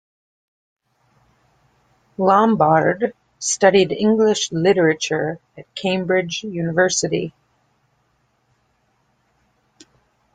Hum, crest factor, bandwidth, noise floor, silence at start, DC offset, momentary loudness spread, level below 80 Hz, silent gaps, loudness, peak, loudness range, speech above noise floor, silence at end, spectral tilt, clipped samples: none; 20 dB; 9.6 kHz; -65 dBFS; 2.2 s; under 0.1%; 11 LU; -60 dBFS; none; -18 LUFS; -2 dBFS; 8 LU; 47 dB; 3.05 s; -4 dB/octave; under 0.1%